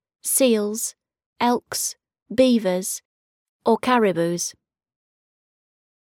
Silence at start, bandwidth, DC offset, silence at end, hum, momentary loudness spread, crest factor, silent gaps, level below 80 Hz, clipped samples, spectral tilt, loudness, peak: 0.25 s; over 20 kHz; under 0.1%; 1.55 s; none; 10 LU; 18 dB; 1.26-1.33 s, 2.22-2.26 s, 3.05-3.60 s; -66 dBFS; under 0.1%; -3.5 dB/octave; -22 LUFS; -4 dBFS